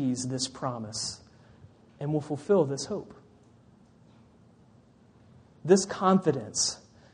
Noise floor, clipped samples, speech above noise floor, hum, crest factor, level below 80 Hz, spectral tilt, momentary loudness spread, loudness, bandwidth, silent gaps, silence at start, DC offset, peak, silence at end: -58 dBFS; under 0.1%; 31 dB; none; 22 dB; -66 dBFS; -4.5 dB/octave; 14 LU; -28 LUFS; 10 kHz; none; 0 s; under 0.1%; -8 dBFS; 0.35 s